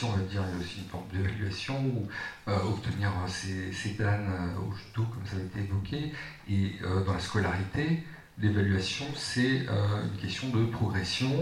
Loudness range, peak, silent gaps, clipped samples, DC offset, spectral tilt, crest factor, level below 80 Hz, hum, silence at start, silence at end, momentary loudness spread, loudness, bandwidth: 3 LU; -14 dBFS; none; under 0.1%; under 0.1%; -6 dB/octave; 16 dB; -52 dBFS; none; 0 s; 0 s; 8 LU; -32 LUFS; 11.5 kHz